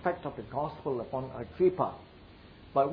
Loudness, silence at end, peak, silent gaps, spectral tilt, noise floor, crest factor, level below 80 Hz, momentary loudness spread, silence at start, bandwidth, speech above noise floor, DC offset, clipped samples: -33 LUFS; 0 s; -14 dBFS; none; -10.5 dB/octave; -53 dBFS; 18 dB; -58 dBFS; 25 LU; 0 s; 5 kHz; 21 dB; under 0.1%; under 0.1%